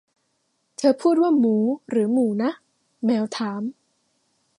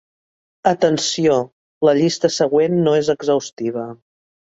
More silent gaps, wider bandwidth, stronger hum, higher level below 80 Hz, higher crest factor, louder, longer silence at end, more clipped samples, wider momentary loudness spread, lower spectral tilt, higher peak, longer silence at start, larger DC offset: second, none vs 1.52-1.81 s, 3.53-3.57 s; first, 11 kHz vs 8 kHz; neither; second, -76 dBFS vs -60 dBFS; about the same, 16 dB vs 16 dB; second, -22 LUFS vs -18 LUFS; first, 0.9 s vs 0.45 s; neither; first, 13 LU vs 9 LU; first, -6.5 dB/octave vs -5 dB/octave; second, -6 dBFS vs -2 dBFS; first, 0.8 s vs 0.65 s; neither